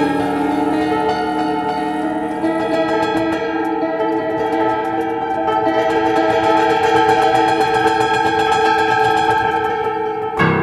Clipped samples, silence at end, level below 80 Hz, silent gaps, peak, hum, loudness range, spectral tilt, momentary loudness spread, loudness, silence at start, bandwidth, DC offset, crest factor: under 0.1%; 0 s; -48 dBFS; none; -2 dBFS; none; 4 LU; -5.5 dB/octave; 6 LU; -16 LUFS; 0 s; 13.5 kHz; under 0.1%; 14 dB